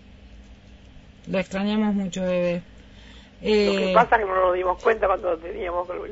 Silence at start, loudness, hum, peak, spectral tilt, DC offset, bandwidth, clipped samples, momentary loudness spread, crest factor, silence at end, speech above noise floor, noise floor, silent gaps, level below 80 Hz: 0.1 s; -23 LUFS; none; -4 dBFS; -6 dB/octave; under 0.1%; 8 kHz; under 0.1%; 10 LU; 20 dB; 0 s; 25 dB; -47 dBFS; none; -46 dBFS